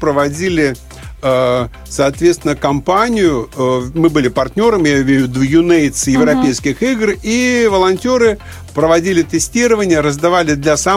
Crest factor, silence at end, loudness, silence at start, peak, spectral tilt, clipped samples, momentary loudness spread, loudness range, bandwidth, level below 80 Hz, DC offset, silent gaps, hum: 12 dB; 0 s; -13 LUFS; 0 s; 0 dBFS; -5 dB/octave; under 0.1%; 5 LU; 2 LU; 16 kHz; -34 dBFS; under 0.1%; none; none